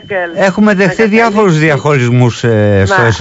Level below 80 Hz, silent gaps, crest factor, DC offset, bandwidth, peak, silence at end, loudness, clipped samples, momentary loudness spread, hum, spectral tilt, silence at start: -40 dBFS; none; 8 dB; under 0.1%; 8 kHz; 0 dBFS; 0 s; -9 LUFS; under 0.1%; 3 LU; none; -6.5 dB/octave; 0 s